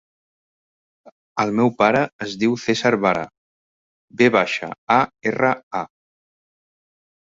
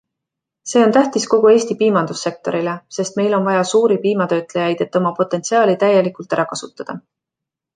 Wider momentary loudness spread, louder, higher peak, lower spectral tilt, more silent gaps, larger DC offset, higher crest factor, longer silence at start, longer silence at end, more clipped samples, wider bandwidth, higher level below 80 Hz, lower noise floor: about the same, 12 LU vs 10 LU; second, -20 LUFS vs -16 LUFS; about the same, -2 dBFS vs -2 dBFS; about the same, -5.5 dB/octave vs -5 dB/octave; first, 2.13-2.19 s, 3.38-4.08 s, 4.78-4.87 s, 5.63-5.71 s vs none; neither; first, 20 dB vs 14 dB; first, 1.35 s vs 0.65 s; first, 1.5 s vs 0.75 s; neither; second, 7.8 kHz vs 9.6 kHz; about the same, -62 dBFS vs -66 dBFS; first, under -90 dBFS vs -84 dBFS